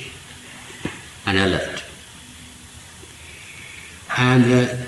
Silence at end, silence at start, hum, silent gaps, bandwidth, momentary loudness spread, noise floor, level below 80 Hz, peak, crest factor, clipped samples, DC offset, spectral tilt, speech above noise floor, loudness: 0 s; 0 s; none; none; 12.5 kHz; 24 LU; -42 dBFS; -50 dBFS; -4 dBFS; 20 dB; under 0.1%; under 0.1%; -5.5 dB/octave; 25 dB; -20 LUFS